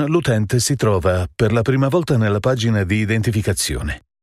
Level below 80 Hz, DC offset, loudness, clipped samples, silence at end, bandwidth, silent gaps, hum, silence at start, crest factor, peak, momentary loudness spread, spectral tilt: -36 dBFS; under 0.1%; -18 LUFS; under 0.1%; 0.25 s; 14.5 kHz; none; none; 0 s; 14 dB; -4 dBFS; 3 LU; -5.5 dB/octave